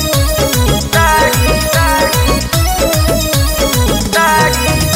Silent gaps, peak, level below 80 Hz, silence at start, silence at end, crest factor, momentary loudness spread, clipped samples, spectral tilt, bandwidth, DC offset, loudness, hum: none; 0 dBFS; -18 dBFS; 0 s; 0 s; 12 dB; 3 LU; under 0.1%; -4 dB/octave; 16.5 kHz; under 0.1%; -11 LUFS; none